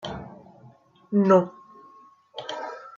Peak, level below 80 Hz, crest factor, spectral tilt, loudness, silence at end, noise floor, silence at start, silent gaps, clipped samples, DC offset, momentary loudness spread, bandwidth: -6 dBFS; -62 dBFS; 20 dB; -7.5 dB/octave; -24 LUFS; 0.05 s; -54 dBFS; 0.05 s; none; under 0.1%; under 0.1%; 22 LU; 7.4 kHz